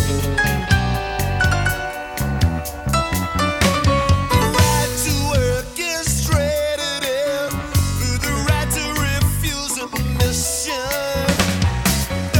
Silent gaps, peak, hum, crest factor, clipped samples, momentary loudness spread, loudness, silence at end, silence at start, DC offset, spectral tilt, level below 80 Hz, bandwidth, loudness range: none; 0 dBFS; none; 18 dB; under 0.1%; 5 LU; -19 LUFS; 0 s; 0 s; under 0.1%; -4 dB/octave; -28 dBFS; 18 kHz; 2 LU